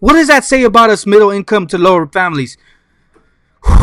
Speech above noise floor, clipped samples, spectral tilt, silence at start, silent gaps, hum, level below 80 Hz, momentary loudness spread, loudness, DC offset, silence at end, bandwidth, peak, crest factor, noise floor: 43 dB; 2%; -5 dB/octave; 0 s; none; none; -20 dBFS; 10 LU; -10 LUFS; under 0.1%; 0 s; 16.5 kHz; 0 dBFS; 10 dB; -52 dBFS